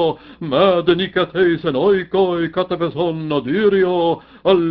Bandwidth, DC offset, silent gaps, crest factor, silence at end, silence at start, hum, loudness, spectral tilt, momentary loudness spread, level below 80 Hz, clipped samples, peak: 5.4 kHz; under 0.1%; none; 16 dB; 0 s; 0 s; none; -17 LUFS; -9.5 dB/octave; 6 LU; -50 dBFS; under 0.1%; -2 dBFS